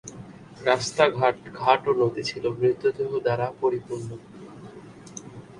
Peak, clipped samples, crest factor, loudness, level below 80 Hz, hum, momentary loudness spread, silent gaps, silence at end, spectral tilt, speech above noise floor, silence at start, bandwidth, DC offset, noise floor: -4 dBFS; under 0.1%; 22 dB; -24 LUFS; -62 dBFS; none; 23 LU; none; 0 s; -5 dB/octave; 20 dB; 0.05 s; 11 kHz; under 0.1%; -44 dBFS